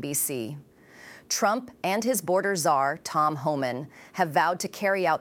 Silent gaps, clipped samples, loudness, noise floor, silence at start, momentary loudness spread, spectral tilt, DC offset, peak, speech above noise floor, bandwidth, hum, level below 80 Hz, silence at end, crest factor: none; under 0.1%; -26 LUFS; -49 dBFS; 0 s; 9 LU; -3.5 dB/octave; under 0.1%; -8 dBFS; 23 dB; 18 kHz; none; -72 dBFS; 0 s; 20 dB